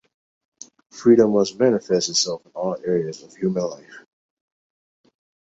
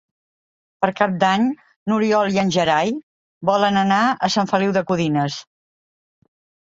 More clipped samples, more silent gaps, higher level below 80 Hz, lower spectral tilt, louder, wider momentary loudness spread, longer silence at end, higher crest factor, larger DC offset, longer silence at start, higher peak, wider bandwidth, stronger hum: neither; second, none vs 1.76-1.86 s, 3.03-3.41 s; about the same, -64 dBFS vs -60 dBFS; about the same, -4.5 dB/octave vs -5.5 dB/octave; about the same, -21 LUFS vs -19 LUFS; first, 14 LU vs 8 LU; first, 1.5 s vs 1.25 s; about the same, 20 dB vs 18 dB; neither; first, 0.95 s vs 0.8 s; about the same, -2 dBFS vs -2 dBFS; about the same, 8 kHz vs 7.8 kHz; neither